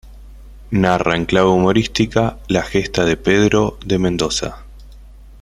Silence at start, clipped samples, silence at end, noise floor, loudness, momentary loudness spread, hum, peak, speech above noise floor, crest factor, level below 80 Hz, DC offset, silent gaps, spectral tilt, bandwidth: 0.05 s; under 0.1%; 0.1 s; -39 dBFS; -16 LUFS; 6 LU; none; 0 dBFS; 23 dB; 18 dB; -36 dBFS; under 0.1%; none; -5.5 dB/octave; 13 kHz